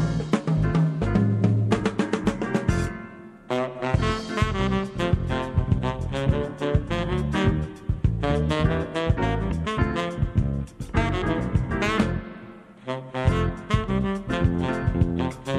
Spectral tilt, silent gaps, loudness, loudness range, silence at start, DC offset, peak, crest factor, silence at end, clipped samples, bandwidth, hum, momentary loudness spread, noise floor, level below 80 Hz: -7 dB/octave; none; -25 LUFS; 2 LU; 0 s; under 0.1%; -6 dBFS; 18 dB; 0 s; under 0.1%; 11.5 kHz; none; 6 LU; -44 dBFS; -34 dBFS